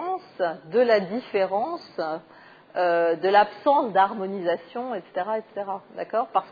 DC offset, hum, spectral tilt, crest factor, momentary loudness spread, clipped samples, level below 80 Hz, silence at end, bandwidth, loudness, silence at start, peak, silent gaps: under 0.1%; none; -7 dB/octave; 18 dB; 12 LU; under 0.1%; -76 dBFS; 0 s; 5 kHz; -25 LUFS; 0 s; -6 dBFS; none